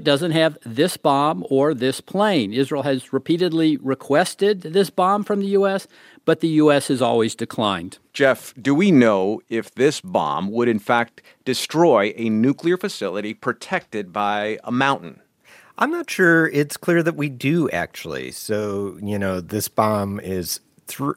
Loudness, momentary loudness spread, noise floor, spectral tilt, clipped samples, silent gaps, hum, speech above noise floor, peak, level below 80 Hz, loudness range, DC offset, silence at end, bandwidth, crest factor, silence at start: -20 LUFS; 10 LU; -51 dBFS; -5 dB/octave; under 0.1%; none; none; 31 dB; -2 dBFS; -64 dBFS; 4 LU; under 0.1%; 0.05 s; 16.5 kHz; 18 dB; 0 s